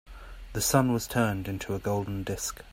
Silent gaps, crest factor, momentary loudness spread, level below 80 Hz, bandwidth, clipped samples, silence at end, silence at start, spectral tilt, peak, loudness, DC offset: none; 20 dB; 13 LU; -46 dBFS; 16 kHz; under 0.1%; 0 s; 0.05 s; -4.5 dB/octave; -8 dBFS; -29 LUFS; under 0.1%